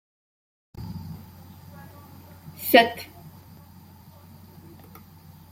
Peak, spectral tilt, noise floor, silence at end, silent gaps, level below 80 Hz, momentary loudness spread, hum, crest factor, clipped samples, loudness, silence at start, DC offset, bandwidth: -2 dBFS; -4.5 dB/octave; -49 dBFS; 2.2 s; none; -60 dBFS; 30 LU; none; 28 dB; under 0.1%; -21 LUFS; 0.75 s; under 0.1%; 16.5 kHz